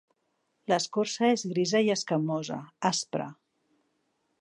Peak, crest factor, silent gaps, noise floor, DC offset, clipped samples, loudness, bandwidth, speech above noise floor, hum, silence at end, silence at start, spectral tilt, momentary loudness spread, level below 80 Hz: -10 dBFS; 20 dB; none; -76 dBFS; under 0.1%; under 0.1%; -28 LUFS; 11 kHz; 48 dB; none; 1.1 s; 0.7 s; -4 dB/octave; 10 LU; -80 dBFS